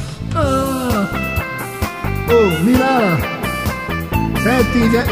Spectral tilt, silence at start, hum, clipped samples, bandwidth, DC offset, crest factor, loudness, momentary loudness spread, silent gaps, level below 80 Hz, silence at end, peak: -6 dB/octave; 0 s; none; under 0.1%; 16 kHz; 0.2%; 16 dB; -16 LUFS; 9 LU; none; -30 dBFS; 0 s; 0 dBFS